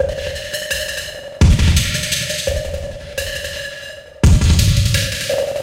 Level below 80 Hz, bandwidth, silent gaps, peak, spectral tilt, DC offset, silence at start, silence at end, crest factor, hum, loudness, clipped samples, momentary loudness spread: -22 dBFS; 16.5 kHz; none; -2 dBFS; -4.5 dB/octave; under 0.1%; 0 s; 0 s; 16 dB; none; -17 LUFS; under 0.1%; 13 LU